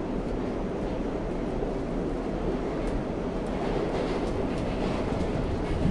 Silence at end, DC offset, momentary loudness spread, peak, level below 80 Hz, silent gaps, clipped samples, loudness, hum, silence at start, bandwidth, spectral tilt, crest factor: 0 s; under 0.1%; 3 LU; -14 dBFS; -36 dBFS; none; under 0.1%; -30 LUFS; none; 0 s; 11 kHz; -7.5 dB/octave; 16 dB